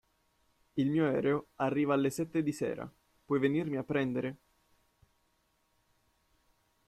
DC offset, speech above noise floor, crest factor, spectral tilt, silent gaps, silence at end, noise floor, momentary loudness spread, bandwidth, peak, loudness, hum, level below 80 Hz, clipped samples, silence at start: under 0.1%; 43 dB; 18 dB; -7 dB/octave; none; 2.5 s; -75 dBFS; 9 LU; 14.5 kHz; -16 dBFS; -32 LUFS; none; -70 dBFS; under 0.1%; 0.75 s